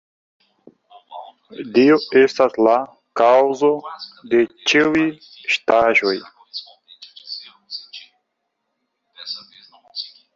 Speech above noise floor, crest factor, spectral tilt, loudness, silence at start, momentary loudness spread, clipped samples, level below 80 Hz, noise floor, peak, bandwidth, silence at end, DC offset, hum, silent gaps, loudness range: 58 dB; 18 dB; -4.5 dB/octave; -17 LUFS; 1.1 s; 22 LU; under 0.1%; -62 dBFS; -75 dBFS; -2 dBFS; 7.6 kHz; 0.3 s; under 0.1%; none; none; 18 LU